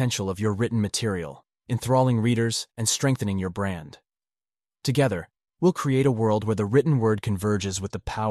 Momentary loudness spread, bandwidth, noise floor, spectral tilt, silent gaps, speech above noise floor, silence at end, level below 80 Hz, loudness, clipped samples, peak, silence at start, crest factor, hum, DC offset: 9 LU; 13.5 kHz; under -90 dBFS; -5.5 dB/octave; none; over 66 dB; 0 s; -52 dBFS; -25 LUFS; under 0.1%; -8 dBFS; 0 s; 16 dB; none; under 0.1%